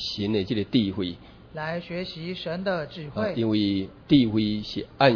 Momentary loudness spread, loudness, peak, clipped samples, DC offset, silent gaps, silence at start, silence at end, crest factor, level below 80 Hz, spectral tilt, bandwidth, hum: 12 LU; -26 LUFS; -4 dBFS; under 0.1%; under 0.1%; none; 0 s; 0 s; 22 dB; -52 dBFS; -7 dB/octave; 5.4 kHz; none